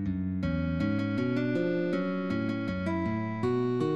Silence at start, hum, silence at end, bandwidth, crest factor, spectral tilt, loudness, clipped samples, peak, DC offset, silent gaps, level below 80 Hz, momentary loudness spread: 0 s; none; 0 s; 8.4 kHz; 12 dB; -8.5 dB/octave; -30 LUFS; under 0.1%; -18 dBFS; 0.2%; none; -50 dBFS; 3 LU